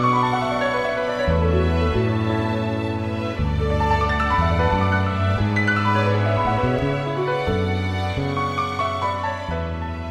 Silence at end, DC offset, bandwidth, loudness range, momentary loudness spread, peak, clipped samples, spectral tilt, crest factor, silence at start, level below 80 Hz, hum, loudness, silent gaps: 0 s; under 0.1%; 10 kHz; 3 LU; 6 LU; -8 dBFS; under 0.1%; -7 dB/octave; 14 dB; 0 s; -32 dBFS; none; -21 LUFS; none